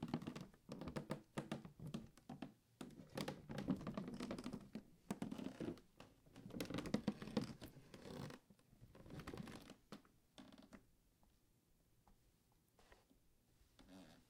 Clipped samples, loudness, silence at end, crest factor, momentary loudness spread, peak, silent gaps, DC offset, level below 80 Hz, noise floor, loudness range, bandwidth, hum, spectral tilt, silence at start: under 0.1%; -51 LUFS; 0.05 s; 26 dB; 18 LU; -26 dBFS; none; under 0.1%; -72 dBFS; -78 dBFS; 12 LU; 16.5 kHz; none; -6 dB/octave; 0 s